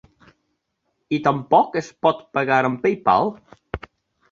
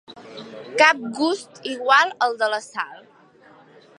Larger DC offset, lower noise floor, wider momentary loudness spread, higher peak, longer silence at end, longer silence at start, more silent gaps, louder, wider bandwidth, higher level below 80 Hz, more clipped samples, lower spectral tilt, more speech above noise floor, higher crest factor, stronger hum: neither; first, -74 dBFS vs -52 dBFS; second, 17 LU vs 21 LU; about the same, -2 dBFS vs 0 dBFS; second, 0.55 s vs 1.05 s; first, 1.1 s vs 0.1 s; neither; about the same, -20 LUFS vs -20 LUFS; second, 7.4 kHz vs 11.5 kHz; first, -52 dBFS vs -78 dBFS; neither; first, -6.5 dB/octave vs -2 dB/octave; first, 54 dB vs 31 dB; about the same, 20 dB vs 22 dB; neither